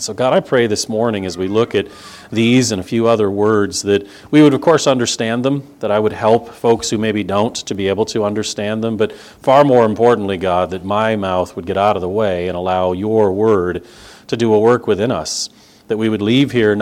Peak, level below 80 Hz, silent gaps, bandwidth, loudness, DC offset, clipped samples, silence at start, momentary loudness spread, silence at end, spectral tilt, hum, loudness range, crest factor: 0 dBFS; -50 dBFS; none; 15 kHz; -16 LUFS; under 0.1%; under 0.1%; 0 s; 8 LU; 0 s; -5 dB/octave; none; 3 LU; 16 dB